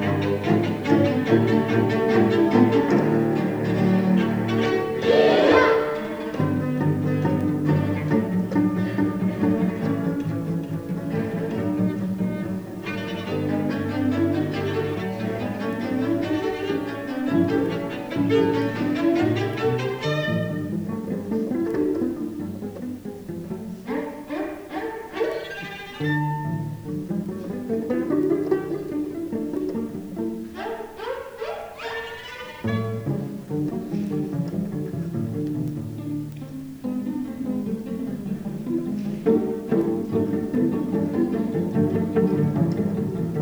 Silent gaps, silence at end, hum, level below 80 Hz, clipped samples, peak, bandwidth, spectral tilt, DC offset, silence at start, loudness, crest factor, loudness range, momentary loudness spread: none; 0 s; none; -54 dBFS; under 0.1%; -4 dBFS; over 20 kHz; -8 dB/octave; under 0.1%; 0 s; -24 LUFS; 20 dB; 10 LU; 11 LU